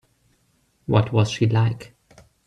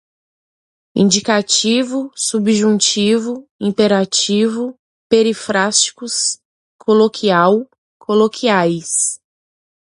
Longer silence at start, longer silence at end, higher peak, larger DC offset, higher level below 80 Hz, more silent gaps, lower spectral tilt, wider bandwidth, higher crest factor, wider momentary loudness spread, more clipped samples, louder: about the same, 0.9 s vs 0.95 s; second, 0.6 s vs 0.75 s; second, -4 dBFS vs 0 dBFS; neither; first, -52 dBFS vs -62 dBFS; second, none vs 3.51-3.59 s, 4.79-5.10 s, 6.45-6.79 s, 7.78-8.00 s; first, -7 dB/octave vs -3.5 dB/octave; second, 9.2 kHz vs 11.5 kHz; about the same, 18 dB vs 16 dB; first, 14 LU vs 10 LU; neither; second, -21 LUFS vs -15 LUFS